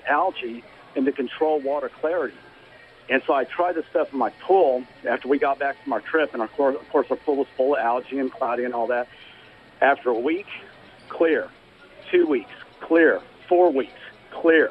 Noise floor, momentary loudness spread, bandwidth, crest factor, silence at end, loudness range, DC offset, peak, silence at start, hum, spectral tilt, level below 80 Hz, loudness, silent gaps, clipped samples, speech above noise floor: -49 dBFS; 14 LU; 5.4 kHz; 18 dB; 0 s; 3 LU; under 0.1%; -4 dBFS; 0.05 s; none; -6.5 dB/octave; -66 dBFS; -23 LUFS; none; under 0.1%; 27 dB